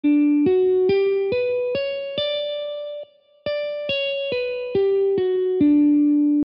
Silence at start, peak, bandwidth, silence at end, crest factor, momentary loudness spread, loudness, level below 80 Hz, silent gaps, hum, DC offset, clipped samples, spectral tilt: 0.05 s; -8 dBFS; 5.6 kHz; 0 s; 12 dB; 11 LU; -21 LUFS; -58 dBFS; none; none; under 0.1%; under 0.1%; -8.5 dB/octave